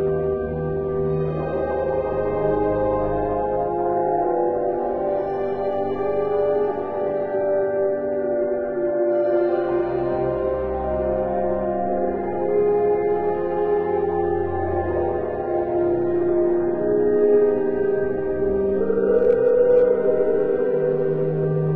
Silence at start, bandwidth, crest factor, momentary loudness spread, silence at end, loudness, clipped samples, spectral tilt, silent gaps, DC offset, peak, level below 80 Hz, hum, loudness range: 0 s; 4.3 kHz; 14 dB; 6 LU; 0 s; -21 LUFS; under 0.1%; -11.5 dB/octave; none; under 0.1%; -6 dBFS; -42 dBFS; none; 3 LU